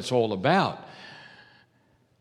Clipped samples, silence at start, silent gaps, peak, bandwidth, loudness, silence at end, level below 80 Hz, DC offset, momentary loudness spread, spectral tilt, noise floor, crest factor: under 0.1%; 0 s; none; -6 dBFS; 13 kHz; -24 LUFS; 0.95 s; -74 dBFS; under 0.1%; 22 LU; -5.5 dB/octave; -65 dBFS; 22 dB